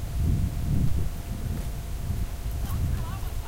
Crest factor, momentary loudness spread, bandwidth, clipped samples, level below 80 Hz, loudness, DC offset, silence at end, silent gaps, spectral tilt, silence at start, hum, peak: 14 dB; 7 LU; 16 kHz; under 0.1%; -30 dBFS; -30 LUFS; under 0.1%; 0 s; none; -6.5 dB/octave; 0 s; none; -12 dBFS